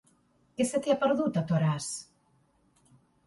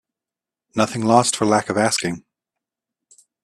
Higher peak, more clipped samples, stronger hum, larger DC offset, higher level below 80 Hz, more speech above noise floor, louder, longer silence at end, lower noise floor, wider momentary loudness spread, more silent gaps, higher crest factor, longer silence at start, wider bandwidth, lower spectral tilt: second, -14 dBFS vs 0 dBFS; neither; neither; neither; second, -68 dBFS vs -60 dBFS; second, 40 dB vs 70 dB; second, -29 LUFS vs -19 LUFS; about the same, 1.25 s vs 1.25 s; second, -68 dBFS vs -89 dBFS; about the same, 12 LU vs 12 LU; neither; about the same, 18 dB vs 22 dB; second, 0.6 s vs 0.75 s; second, 11.5 kHz vs 13 kHz; first, -6 dB/octave vs -4 dB/octave